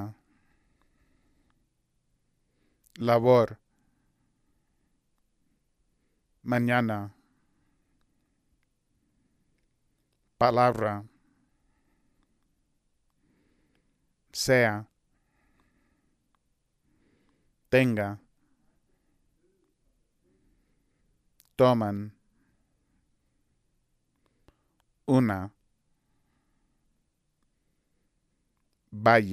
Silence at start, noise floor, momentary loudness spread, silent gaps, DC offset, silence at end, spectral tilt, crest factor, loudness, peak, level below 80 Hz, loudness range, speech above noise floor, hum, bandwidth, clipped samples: 0 s; -75 dBFS; 21 LU; none; under 0.1%; 0 s; -6 dB/octave; 26 dB; -25 LUFS; -6 dBFS; -66 dBFS; 7 LU; 51 dB; none; 15.5 kHz; under 0.1%